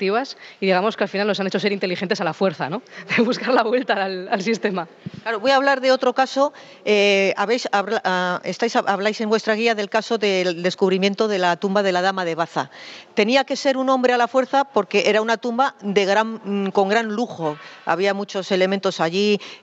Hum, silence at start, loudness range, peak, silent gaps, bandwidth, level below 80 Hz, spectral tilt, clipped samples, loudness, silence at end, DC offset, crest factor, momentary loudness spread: none; 0 s; 2 LU; -2 dBFS; none; 8.2 kHz; -74 dBFS; -4.5 dB/octave; under 0.1%; -20 LUFS; 0.05 s; under 0.1%; 18 dB; 7 LU